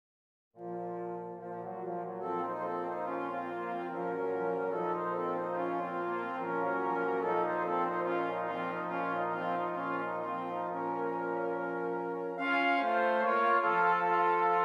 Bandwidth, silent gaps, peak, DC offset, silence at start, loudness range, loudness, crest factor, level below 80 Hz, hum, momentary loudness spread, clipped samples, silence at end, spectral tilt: 8.8 kHz; none; -18 dBFS; under 0.1%; 0.55 s; 7 LU; -33 LUFS; 16 dB; -88 dBFS; none; 11 LU; under 0.1%; 0 s; -7 dB/octave